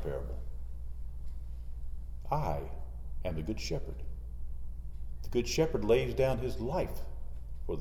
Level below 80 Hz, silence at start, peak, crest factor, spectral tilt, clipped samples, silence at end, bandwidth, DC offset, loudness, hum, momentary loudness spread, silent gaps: -40 dBFS; 0 s; -16 dBFS; 18 dB; -6 dB/octave; under 0.1%; 0 s; 14 kHz; under 0.1%; -36 LUFS; none; 16 LU; none